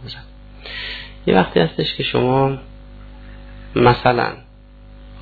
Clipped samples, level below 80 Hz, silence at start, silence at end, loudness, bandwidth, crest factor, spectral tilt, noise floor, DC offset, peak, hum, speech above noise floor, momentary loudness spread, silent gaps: under 0.1%; -40 dBFS; 0 s; 0 s; -18 LUFS; 4.9 kHz; 18 dB; -9 dB/octave; -42 dBFS; under 0.1%; -2 dBFS; 50 Hz at -40 dBFS; 26 dB; 23 LU; none